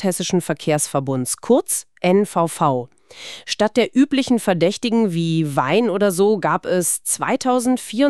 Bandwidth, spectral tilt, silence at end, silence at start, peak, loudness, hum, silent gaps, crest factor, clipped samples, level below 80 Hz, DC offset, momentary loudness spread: 14 kHz; -4.5 dB/octave; 0 s; 0 s; -2 dBFS; -19 LUFS; none; none; 16 dB; under 0.1%; -62 dBFS; 0.3%; 6 LU